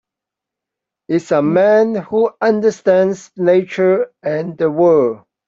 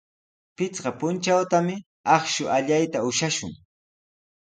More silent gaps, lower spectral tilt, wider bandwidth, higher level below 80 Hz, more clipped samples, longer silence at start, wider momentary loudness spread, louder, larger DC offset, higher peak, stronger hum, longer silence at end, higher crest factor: second, none vs 1.86-2.04 s; first, -7 dB/octave vs -4 dB/octave; second, 7.8 kHz vs 9.6 kHz; about the same, -60 dBFS vs -64 dBFS; neither; first, 1.1 s vs 0.6 s; about the same, 8 LU vs 9 LU; first, -15 LUFS vs -24 LUFS; neither; first, 0 dBFS vs -4 dBFS; neither; second, 0.3 s vs 1 s; second, 14 dB vs 22 dB